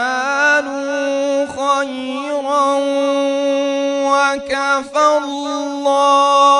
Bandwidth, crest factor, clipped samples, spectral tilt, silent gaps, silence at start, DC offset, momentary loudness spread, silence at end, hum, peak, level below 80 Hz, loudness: 11 kHz; 14 dB; under 0.1%; -1.5 dB/octave; none; 0 s; under 0.1%; 9 LU; 0 s; none; -2 dBFS; -60 dBFS; -16 LUFS